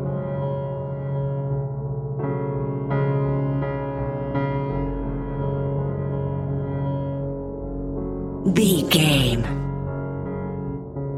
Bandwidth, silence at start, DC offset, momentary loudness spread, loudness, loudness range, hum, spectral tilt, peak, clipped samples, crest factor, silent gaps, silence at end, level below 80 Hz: 15.5 kHz; 0 s; under 0.1%; 11 LU; -25 LUFS; 5 LU; none; -6 dB/octave; -4 dBFS; under 0.1%; 20 dB; none; 0 s; -38 dBFS